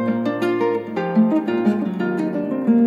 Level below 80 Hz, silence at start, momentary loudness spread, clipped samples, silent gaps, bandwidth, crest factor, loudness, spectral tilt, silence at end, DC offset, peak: -68 dBFS; 0 s; 5 LU; under 0.1%; none; 7.2 kHz; 14 dB; -20 LUFS; -8.5 dB/octave; 0 s; under 0.1%; -6 dBFS